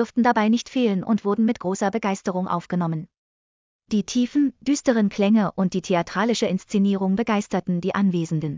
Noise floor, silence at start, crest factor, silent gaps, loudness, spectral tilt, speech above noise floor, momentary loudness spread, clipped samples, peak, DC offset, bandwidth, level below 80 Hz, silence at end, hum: under -90 dBFS; 0 s; 18 dB; 3.17-3.79 s; -22 LUFS; -6 dB/octave; over 68 dB; 6 LU; under 0.1%; -4 dBFS; under 0.1%; 7.6 kHz; -60 dBFS; 0 s; none